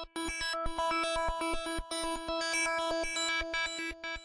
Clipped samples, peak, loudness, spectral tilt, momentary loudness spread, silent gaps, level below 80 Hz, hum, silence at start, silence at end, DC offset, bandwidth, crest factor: under 0.1%; -22 dBFS; -33 LUFS; -2 dB/octave; 6 LU; none; -46 dBFS; none; 0 s; 0 s; under 0.1%; 11.5 kHz; 12 dB